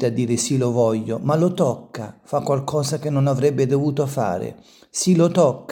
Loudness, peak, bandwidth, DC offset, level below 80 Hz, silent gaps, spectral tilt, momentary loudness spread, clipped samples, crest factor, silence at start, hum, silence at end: -20 LUFS; -4 dBFS; 17.5 kHz; under 0.1%; -62 dBFS; none; -6 dB/octave; 11 LU; under 0.1%; 16 dB; 0 s; none; 0 s